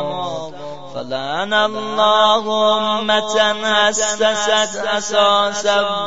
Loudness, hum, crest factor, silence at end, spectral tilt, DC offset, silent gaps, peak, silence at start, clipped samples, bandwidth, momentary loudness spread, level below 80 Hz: -16 LUFS; none; 16 dB; 0 s; -1.5 dB/octave; 2%; none; 0 dBFS; 0 s; under 0.1%; 8 kHz; 12 LU; -58 dBFS